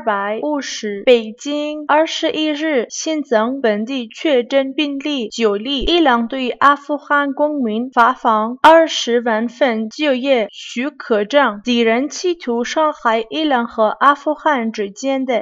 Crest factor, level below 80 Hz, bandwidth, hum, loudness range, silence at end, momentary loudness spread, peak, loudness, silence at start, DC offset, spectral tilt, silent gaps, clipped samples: 16 dB; -46 dBFS; 10.5 kHz; none; 3 LU; 0 s; 8 LU; 0 dBFS; -16 LUFS; 0 s; under 0.1%; -3.5 dB/octave; none; under 0.1%